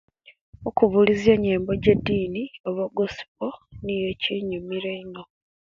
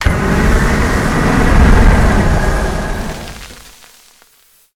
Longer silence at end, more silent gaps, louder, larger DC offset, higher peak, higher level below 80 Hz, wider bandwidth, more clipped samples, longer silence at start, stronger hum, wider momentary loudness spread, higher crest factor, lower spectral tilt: second, 0.55 s vs 1.15 s; first, 2.60-2.64 s, 3.28-3.35 s vs none; second, -24 LUFS vs -13 LUFS; neither; about the same, -2 dBFS vs 0 dBFS; second, -48 dBFS vs -14 dBFS; second, 7.4 kHz vs 15.5 kHz; neither; first, 0.6 s vs 0 s; neither; about the same, 15 LU vs 16 LU; first, 22 dB vs 12 dB; about the same, -7 dB/octave vs -6 dB/octave